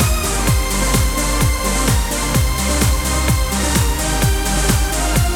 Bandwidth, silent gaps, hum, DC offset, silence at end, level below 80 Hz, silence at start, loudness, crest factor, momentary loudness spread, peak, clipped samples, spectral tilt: 16 kHz; none; none; under 0.1%; 0 s; -20 dBFS; 0 s; -17 LUFS; 12 dB; 1 LU; -4 dBFS; under 0.1%; -4 dB/octave